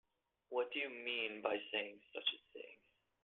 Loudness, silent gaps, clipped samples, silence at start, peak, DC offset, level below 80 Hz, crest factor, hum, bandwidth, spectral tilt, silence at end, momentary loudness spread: -41 LUFS; none; under 0.1%; 0.5 s; -20 dBFS; under 0.1%; -90 dBFS; 24 dB; none; 4.3 kHz; -4.5 dB/octave; 0.5 s; 15 LU